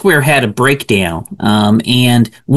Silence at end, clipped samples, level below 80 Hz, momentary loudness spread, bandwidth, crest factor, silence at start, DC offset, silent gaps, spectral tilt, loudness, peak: 0 s; under 0.1%; -44 dBFS; 4 LU; 13 kHz; 10 dB; 0 s; under 0.1%; none; -5.5 dB/octave; -11 LUFS; 0 dBFS